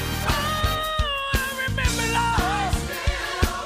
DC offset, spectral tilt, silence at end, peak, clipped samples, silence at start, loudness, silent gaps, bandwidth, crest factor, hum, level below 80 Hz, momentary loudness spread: under 0.1%; -3.5 dB/octave; 0 s; -6 dBFS; under 0.1%; 0 s; -24 LUFS; none; 15.5 kHz; 18 dB; none; -30 dBFS; 4 LU